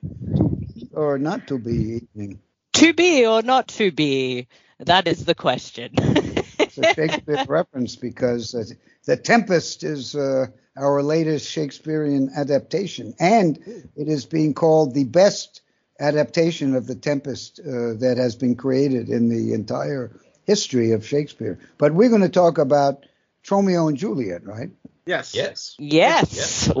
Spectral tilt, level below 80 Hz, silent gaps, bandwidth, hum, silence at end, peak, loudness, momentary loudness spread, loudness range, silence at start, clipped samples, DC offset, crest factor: -4.5 dB/octave; -50 dBFS; none; 7.6 kHz; none; 0 s; -2 dBFS; -20 LUFS; 14 LU; 4 LU; 0.05 s; under 0.1%; under 0.1%; 20 dB